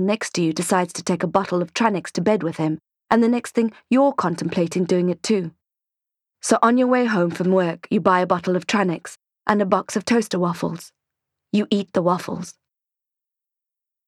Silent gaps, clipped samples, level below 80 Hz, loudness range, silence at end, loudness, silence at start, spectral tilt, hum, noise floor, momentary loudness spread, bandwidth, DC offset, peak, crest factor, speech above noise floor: none; under 0.1%; -64 dBFS; 4 LU; 1.55 s; -21 LUFS; 0 s; -5.5 dB/octave; none; -87 dBFS; 9 LU; 13.5 kHz; under 0.1%; -4 dBFS; 18 dB; 67 dB